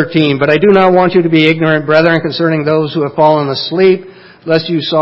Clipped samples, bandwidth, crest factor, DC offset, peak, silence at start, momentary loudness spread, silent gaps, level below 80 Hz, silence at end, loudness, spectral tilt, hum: 0.3%; 8 kHz; 10 dB; under 0.1%; 0 dBFS; 0 s; 7 LU; none; -50 dBFS; 0 s; -11 LUFS; -8 dB/octave; none